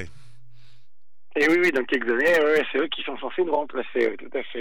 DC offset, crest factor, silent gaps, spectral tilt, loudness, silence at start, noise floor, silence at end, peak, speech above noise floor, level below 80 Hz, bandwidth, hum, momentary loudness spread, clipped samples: 2%; 14 dB; none; -4.5 dB/octave; -23 LUFS; 0 s; -75 dBFS; 0 s; -10 dBFS; 52 dB; -66 dBFS; 19 kHz; none; 12 LU; under 0.1%